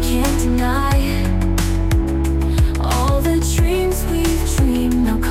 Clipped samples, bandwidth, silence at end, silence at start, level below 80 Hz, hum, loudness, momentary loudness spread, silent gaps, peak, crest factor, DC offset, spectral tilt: under 0.1%; 16.5 kHz; 0 s; 0 s; -20 dBFS; none; -18 LUFS; 2 LU; none; -6 dBFS; 10 dB; under 0.1%; -5.5 dB/octave